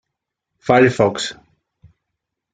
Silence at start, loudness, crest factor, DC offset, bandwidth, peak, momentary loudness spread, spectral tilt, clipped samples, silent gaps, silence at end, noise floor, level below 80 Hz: 0.65 s; -16 LUFS; 20 dB; under 0.1%; 9.4 kHz; 0 dBFS; 14 LU; -5.5 dB/octave; under 0.1%; none; 1.2 s; -80 dBFS; -58 dBFS